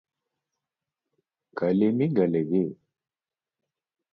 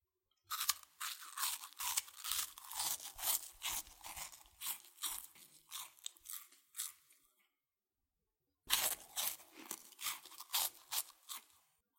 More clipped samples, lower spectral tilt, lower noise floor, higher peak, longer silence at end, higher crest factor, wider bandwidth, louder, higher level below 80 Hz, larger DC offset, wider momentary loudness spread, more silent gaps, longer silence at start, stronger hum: neither; first, -11.5 dB/octave vs 2.5 dB/octave; about the same, under -90 dBFS vs under -90 dBFS; about the same, -10 dBFS vs -12 dBFS; first, 1.4 s vs 0.55 s; second, 18 dB vs 32 dB; second, 5.4 kHz vs 17 kHz; first, -25 LUFS vs -41 LUFS; first, -68 dBFS vs -74 dBFS; neither; second, 9 LU vs 13 LU; neither; first, 1.55 s vs 0.5 s; neither